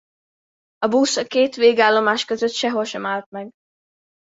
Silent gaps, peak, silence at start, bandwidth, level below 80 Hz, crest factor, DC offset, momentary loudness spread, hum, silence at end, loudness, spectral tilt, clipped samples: 3.26-3.32 s; -2 dBFS; 0.8 s; 8 kHz; -68 dBFS; 20 dB; under 0.1%; 13 LU; none; 0.75 s; -19 LUFS; -3 dB/octave; under 0.1%